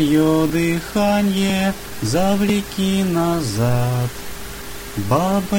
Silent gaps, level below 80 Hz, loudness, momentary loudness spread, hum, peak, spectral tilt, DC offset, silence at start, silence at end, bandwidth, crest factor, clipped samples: none; -38 dBFS; -19 LUFS; 12 LU; none; -4 dBFS; -5.5 dB/octave; under 0.1%; 0 s; 0 s; over 20 kHz; 14 dB; under 0.1%